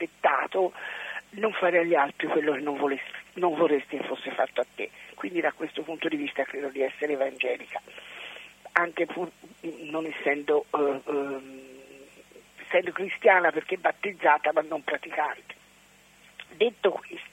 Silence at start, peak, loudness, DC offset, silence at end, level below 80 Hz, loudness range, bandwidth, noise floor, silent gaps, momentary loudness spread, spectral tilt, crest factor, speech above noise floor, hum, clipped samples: 0 s; -2 dBFS; -27 LUFS; under 0.1%; 0.05 s; -74 dBFS; 5 LU; 16 kHz; -57 dBFS; none; 17 LU; -5 dB/octave; 26 dB; 30 dB; 50 Hz at -70 dBFS; under 0.1%